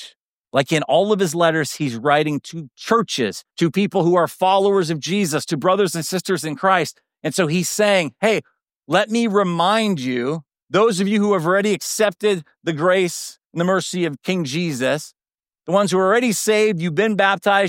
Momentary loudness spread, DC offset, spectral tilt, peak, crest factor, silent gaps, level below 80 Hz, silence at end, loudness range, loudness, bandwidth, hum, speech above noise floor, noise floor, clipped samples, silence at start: 7 LU; under 0.1%; -4.5 dB/octave; -2 dBFS; 18 dB; 0.20-0.37 s, 10.63-10.67 s, 13.46-13.50 s; -68 dBFS; 0 s; 2 LU; -19 LUFS; 17 kHz; none; 57 dB; -75 dBFS; under 0.1%; 0 s